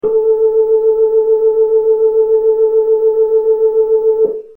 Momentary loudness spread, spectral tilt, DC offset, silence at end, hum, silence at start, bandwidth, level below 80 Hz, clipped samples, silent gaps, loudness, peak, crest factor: 1 LU; -9 dB/octave; under 0.1%; 0.1 s; none; 0.05 s; 1.4 kHz; -52 dBFS; under 0.1%; none; -12 LUFS; -4 dBFS; 8 dB